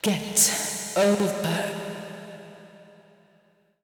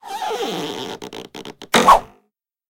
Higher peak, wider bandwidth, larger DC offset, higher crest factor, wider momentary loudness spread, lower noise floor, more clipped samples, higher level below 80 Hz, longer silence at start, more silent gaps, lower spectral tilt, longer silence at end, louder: second, -10 dBFS vs 0 dBFS; first, over 20 kHz vs 17 kHz; neither; about the same, 18 dB vs 20 dB; about the same, 21 LU vs 22 LU; second, -63 dBFS vs -69 dBFS; neither; second, -66 dBFS vs -44 dBFS; about the same, 0.05 s vs 0.05 s; neither; about the same, -3 dB/octave vs -2.5 dB/octave; first, 1 s vs 0.65 s; second, -23 LUFS vs -17 LUFS